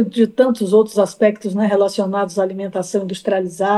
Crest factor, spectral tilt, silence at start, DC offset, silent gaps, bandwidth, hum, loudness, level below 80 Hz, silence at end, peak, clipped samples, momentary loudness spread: 16 dB; -6 dB/octave; 0 s; under 0.1%; none; 12.5 kHz; none; -17 LUFS; -66 dBFS; 0 s; -2 dBFS; under 0.1%; 7 LU